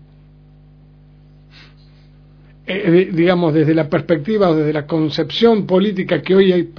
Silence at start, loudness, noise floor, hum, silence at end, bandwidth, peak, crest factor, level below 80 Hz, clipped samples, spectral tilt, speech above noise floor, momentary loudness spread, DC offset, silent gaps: 2.65 s; -15 LUFS; -45 dBFS; 50 Hz at -45 dBFS; 0.1 s; 5.4 kHz; 0 dBFS; 16 dB; -50 dBFS; under 0.1%; -8.5 dB/octave; 30 dB; 6 LU; under 0.1%; none